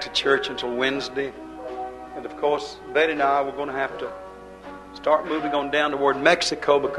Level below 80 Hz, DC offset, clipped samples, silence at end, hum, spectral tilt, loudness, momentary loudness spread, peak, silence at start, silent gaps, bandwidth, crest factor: -54 dBFS; under 0.1%; under 0.1%; 0 s; none; -3 dB/octave; -23 LUFS; 17 LU; -2 dBFS; 0 s; none; 12 kHz; 22 dB